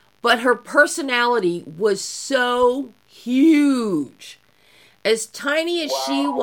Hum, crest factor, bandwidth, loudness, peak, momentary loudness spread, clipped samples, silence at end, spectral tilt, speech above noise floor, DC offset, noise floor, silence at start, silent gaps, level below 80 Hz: none; 18 dB; 17 kHz; -19 LUFS; -2 dBFS; 9 LU; under 0.1%; 0 s; -3 dB/octave; 35 dB; under 0.1%; -54 dBFS; 0.25 s; none; -64 dBFS